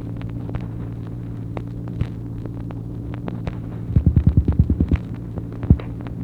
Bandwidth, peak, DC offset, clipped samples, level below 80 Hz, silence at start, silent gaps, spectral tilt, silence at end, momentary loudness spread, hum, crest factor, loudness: 4.5 kHz; 0 dBFS; under 0.1%; under 0.1%; -28 dBFS; 0 s; none; -10.5 dB/octave; 0 s; 13 LU; none; 22 dB; -24 LUFS